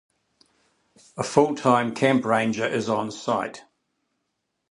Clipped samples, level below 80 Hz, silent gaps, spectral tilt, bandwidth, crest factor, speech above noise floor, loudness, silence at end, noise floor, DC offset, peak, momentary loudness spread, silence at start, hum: under 0.1%; -64 dBFS; none; -5.5 dB/octave; 11 kHz; 22 dB; 55 dB; -23 LUFS; 1.1 s; -78 dBFS; under 0.1%; -2 dBFS; 9 LU; 1.15 s; none